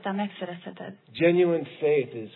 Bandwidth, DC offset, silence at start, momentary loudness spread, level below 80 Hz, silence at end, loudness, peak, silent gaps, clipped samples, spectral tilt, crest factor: 4.2 kHz; under 0.1%; 0 s; 18 LU; -78 dBFS; 0.05 s; -25 LUFS; -10 dBFS; none; under 0.1%; -10.5 dB/octave; 18 dB